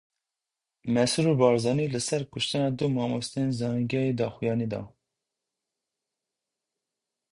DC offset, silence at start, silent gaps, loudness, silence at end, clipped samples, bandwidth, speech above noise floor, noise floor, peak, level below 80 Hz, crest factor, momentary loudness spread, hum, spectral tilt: under 0.1%; 0.85 s; none; -27 LUFS; 2.45 s; under 0.1%; 11.5 kHz; 62 dB; -88 dBFS; -8 dBFS; -64 dBFS; 22 dB; 7 LU; none; -5.5 dB/octave